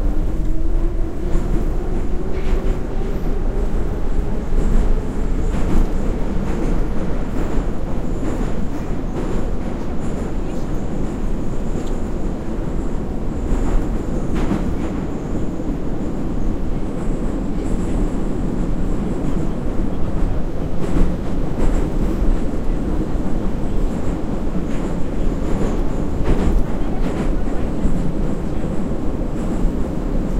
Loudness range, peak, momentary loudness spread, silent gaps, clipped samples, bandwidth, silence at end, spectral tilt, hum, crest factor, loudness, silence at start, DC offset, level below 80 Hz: 3 LU; -2 dBFS; 4 LU; none; under 0.1%; 8.4 kHz; 0 s; -8 dB/octave; none; 14 dB; -24 LUFS; 0 s; under 0.1%; -20 dBFS